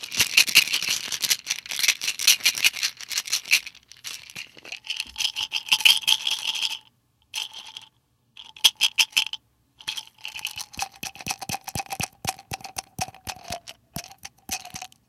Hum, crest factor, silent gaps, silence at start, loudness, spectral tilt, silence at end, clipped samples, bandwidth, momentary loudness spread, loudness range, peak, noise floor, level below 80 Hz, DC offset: none; 26 dB; none; 0 s; -22 LUFS; 1 dB/octave; 0.2 s; under 0.1%; 17 kHz; 20 LU; 11 LU; 0 dBFS; -64 dBFS; -60 dBFS; under 0.1%